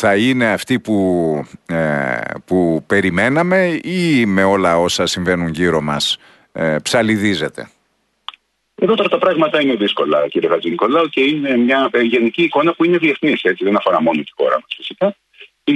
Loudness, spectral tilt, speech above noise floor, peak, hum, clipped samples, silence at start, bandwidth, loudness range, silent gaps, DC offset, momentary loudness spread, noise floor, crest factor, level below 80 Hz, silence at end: -16 LUFS; -5 dB/octave; 49 dB; -2 dBFS; none; under 0.1%; 0 s; 12 kHz; 3 LU; none; under 0.1%; 7 LU; -64 dBFS; 14 dB; -52 dBFS; 0 s